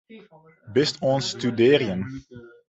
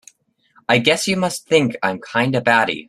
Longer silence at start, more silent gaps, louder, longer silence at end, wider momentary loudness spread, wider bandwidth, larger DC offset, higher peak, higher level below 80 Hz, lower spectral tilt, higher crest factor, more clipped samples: second, 0.1 s vs 0.7 s; neither; second, -22 LUFS vs -17 LUFS; first, 0.2 s vs 0.05 s; first, 14 LU vs 6 LU; second, 8.2 kHz vs 15 kHz; neither; second, -4 dBFS vs 0 dBFS; about the same, -58 dBFS vs -58 dBFS; first, -5.5 dB/octave vs -4 dB/octave; about the same, 20 dB vs 18 dB; neither